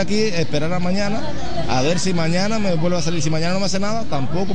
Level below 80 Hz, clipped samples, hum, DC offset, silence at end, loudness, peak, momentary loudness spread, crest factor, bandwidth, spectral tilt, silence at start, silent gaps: -40 dBFS; under 0.1%; none; 10%; 0 s; -21 LUFS; -4 dBFS; 4 LU; 16 dB; 10 kHz; -5 dB/octave; 0 s; none